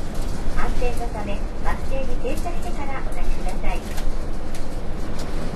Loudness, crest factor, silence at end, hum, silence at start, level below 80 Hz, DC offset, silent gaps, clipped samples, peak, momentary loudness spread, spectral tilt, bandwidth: -29 LUFS; 12 dB; 0 s; none; 0 s; -24 dBFS; under 0.1%; none; under 0.1%; -6 dBFS; 5 LU; -5.5 dB/octave; 12 kHz